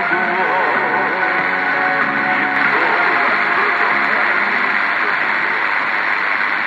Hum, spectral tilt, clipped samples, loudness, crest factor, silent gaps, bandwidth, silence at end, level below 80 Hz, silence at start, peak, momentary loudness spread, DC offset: none; -4.5 dB/octave; under 0.1%; -15 LUFS; 14 dB; none; 11.5 kHz; 0 s; -64 dBFS; 0 s; -2 dBFS; 2 LU; under 0.1%